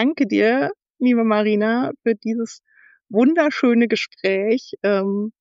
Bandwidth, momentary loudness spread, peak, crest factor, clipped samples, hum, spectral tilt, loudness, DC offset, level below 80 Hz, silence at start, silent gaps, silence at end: 7.6 kHz; 7 LU; -4 dBFS; 14 dB; under 0.1%; none; -4.5 dB/octave; -19 LUFS; under 0.1%; -76 dBFS; 0 s; 0.90-0.94 s; 0.1 s